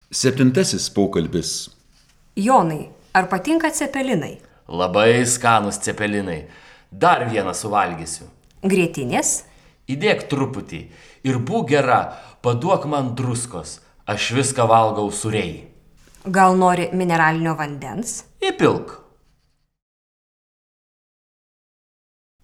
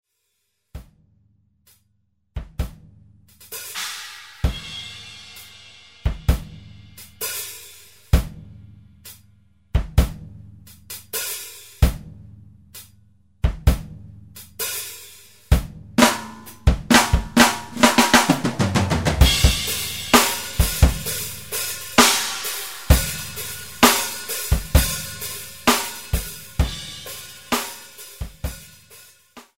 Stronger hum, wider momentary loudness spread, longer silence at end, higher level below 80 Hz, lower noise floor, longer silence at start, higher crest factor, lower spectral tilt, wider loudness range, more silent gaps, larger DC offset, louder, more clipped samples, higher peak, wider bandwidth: neither; second, 15 LU vs 24 LU; first, 3.45 s vs 0.15 s; second, -52 dBFS vs -28 dBFS; second, -64 dBFS vs -73 dBFS; second, 0.1 s vs 0.75 s; about the same, 20 dB vs 22 dB; about the same, -4.5 dB/octave vs -3.5 dB/octave; second, 4 LU vs 14 LU; neither; second, under 0.1% vs 0.2%; about the same, -19 LUFS vs -20 LUFS; neither; about the same, -2 dBFS vs 0 dBFS; about the same, 16.5 kHz vs 16.5 kHz